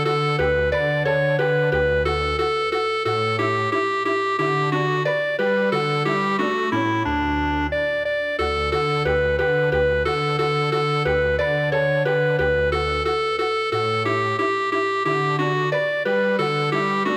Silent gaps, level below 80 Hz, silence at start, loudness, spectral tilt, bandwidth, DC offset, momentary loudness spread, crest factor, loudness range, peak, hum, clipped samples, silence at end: none; -38 dBFS; 0 s; -21 LUFS; -6 dB/octave; 10.5 kHz; under 0.1%; 2 LU; 12 dB; 1 LU; -10 dBFS; none; under 0.1%; 0 s